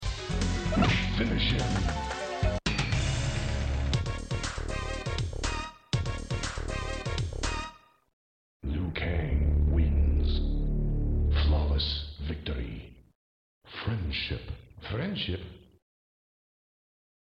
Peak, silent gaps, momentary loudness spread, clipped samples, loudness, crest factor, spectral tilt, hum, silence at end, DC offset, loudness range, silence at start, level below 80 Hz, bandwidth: -10 dBFS; 8.13-8.60 s, 13.15-13.61 s; 11 LU; under 0.1%; -31 LUFS; 20 dB; -5.5 dB/octave; none; 1.7 s; under 0.1%; 7 LU; 0 s; -32 dBFS; 9.4 kHz